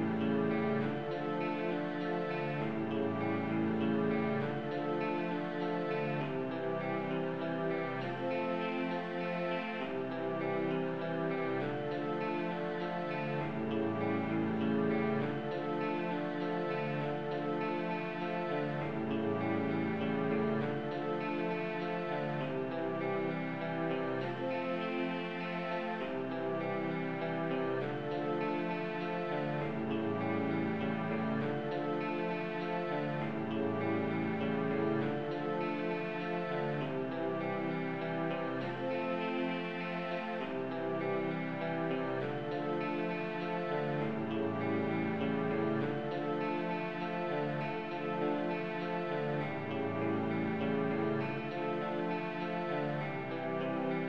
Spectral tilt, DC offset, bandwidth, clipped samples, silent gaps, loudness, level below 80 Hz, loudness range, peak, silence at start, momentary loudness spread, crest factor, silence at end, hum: -8.5 dB/octave; 0.2%; 7.2 kHz; under 0.1%; none; -36 LUFS; -72 dBFS; 2 LU; -22 dBFS; 0 s; 3 LU; 14 dB; 0 s; none